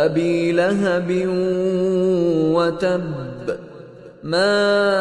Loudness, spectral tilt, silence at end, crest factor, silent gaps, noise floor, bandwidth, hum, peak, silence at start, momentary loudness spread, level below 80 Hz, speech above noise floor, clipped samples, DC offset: -19 LUFS; -6.5 dB/octave; 0 s; 14 dB; none; -40 dBFS; 11 kHz; none; -6 dBFS; 0 s; 12 LU; -54 dBFS; 22 dB; under 0.1%; under 0.1%